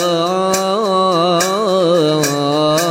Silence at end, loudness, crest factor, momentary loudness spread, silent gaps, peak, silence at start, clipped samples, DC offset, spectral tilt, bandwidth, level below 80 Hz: 0 s; -14 LUFS; 12 dB; 2 LU; none; -2 dBFS; 0 s; under 0.1%; under 0.1%; -4 dB/octave; 16.5 kHz; -60 dBFS